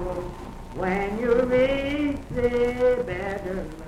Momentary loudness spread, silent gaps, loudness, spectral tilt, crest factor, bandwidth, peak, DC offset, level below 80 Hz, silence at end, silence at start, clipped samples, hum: 12 LU; none; -25 LUFS; -7 dB/octave; 14 dB; 12 kHz; -10 dBFS; under 0.1%; -40 dBFS; 0 s; 0 s; under 0.1%; none